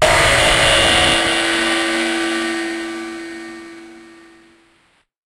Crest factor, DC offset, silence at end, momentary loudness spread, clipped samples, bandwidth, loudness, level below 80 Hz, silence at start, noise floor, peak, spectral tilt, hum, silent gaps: 18 dB; under 0.1%; 1.2 s; 20 LU; under 0.1%; 16 kHz; -14 LUFS; -34 dBFS; 0 s; -58 dBFS; 0 dBFS; -2.5 dB/octave; none; none